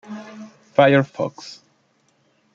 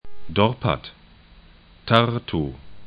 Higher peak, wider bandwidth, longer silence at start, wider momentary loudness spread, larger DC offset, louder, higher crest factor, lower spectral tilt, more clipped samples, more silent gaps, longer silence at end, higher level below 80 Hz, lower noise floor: about the same, -2 dBFS vs 0 dBFS; first, 7.6 kHz vs 5.2 kHz; about the same, 0.1 s vs 0.05 s; first, 24 LU vs 15 LU; neither; first, -18 LUFS vs -22 LUFS; about the same, 20 dB vs 24 dB; second, -6.5 dB/octave vs -8 dB/octave; neither; neither; first, 1 s vs 0 s; second, -68 dBFS vs -46 dBFS; first, -63 dBFS vs -49 dBFS